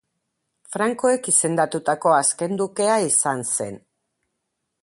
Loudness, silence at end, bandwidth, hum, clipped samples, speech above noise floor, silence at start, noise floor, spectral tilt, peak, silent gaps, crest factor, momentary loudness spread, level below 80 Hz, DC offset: -20 LUFS; 1.05 s; 11.5 kHz; none; under 0.1%; 57 dB; 0.7 s; -78 dBFS; -3 dB/octave; -4 dBFS; none; 18 dB; 7 LU; -68 dBFS; under 0.1%